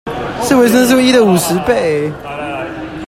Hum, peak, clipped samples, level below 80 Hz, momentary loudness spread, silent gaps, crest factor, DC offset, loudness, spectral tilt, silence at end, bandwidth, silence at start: none; 0 dBFS; under 0.1%; -42 dBFS; 13 LU; none; 12 dB; under 0.1%; -12 LUFS; -4.5 dB/octave; 0 s; 16.5 kHz; 0.05 s